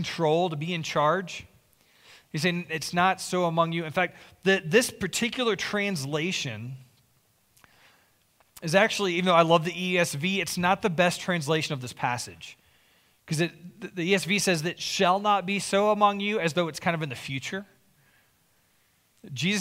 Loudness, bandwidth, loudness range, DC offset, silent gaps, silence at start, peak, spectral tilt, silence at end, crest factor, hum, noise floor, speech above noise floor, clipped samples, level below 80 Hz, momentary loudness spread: -26 LUFS; 16 kHz; 6 LU; under 0.1%; none; 0 s; -6 dBFS; -4 dB/octave; 0 s; 22 dB; none; -66 dBFS; 40 dB; under 0.1%; -66 dBFS; 12 LU